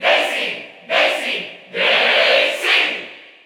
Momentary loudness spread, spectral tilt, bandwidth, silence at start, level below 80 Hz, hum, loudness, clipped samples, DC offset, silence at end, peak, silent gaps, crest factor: 15 LU; -1 dB/octave; 18.5 kHz; 0 s; -82 dBFS; none; -15 LUFS; under 0.1%; under 0.1%; 0.2 s; -2 dBFS; none; 16 dB